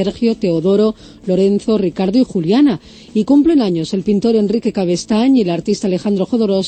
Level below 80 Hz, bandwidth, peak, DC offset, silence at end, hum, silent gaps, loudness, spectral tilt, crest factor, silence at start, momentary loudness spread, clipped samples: -46 dBFS; 8.8 kHz; -2 dBFS; under 0.1%; 0 s; none; none; -15 LUFS; -7 dB/octave; 12 dB; 0 s; 6 LU; under 0.1%